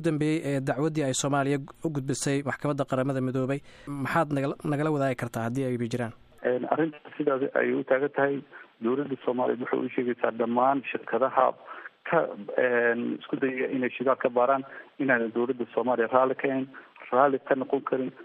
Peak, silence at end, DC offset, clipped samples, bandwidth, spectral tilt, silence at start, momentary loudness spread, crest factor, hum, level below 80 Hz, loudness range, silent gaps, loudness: -8 dBFS; 0 s; under 0.1%; under 0.1%; 14.5 kHz; -6 dB/octave; 0 s; 8 LU; 20 dB; none; -66 dBFS; 2 LU; none; -27 LUFS